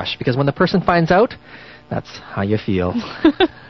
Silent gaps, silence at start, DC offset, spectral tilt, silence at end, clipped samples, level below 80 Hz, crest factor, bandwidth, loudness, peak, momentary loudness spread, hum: none; 0 s; 0.2%; -7.5 dB/octave; 0 s; under 0.1%; -44 dBFS; 18 dB; 6.4 kHz; -18 LUFS; 0 dBFS; 13 LU; none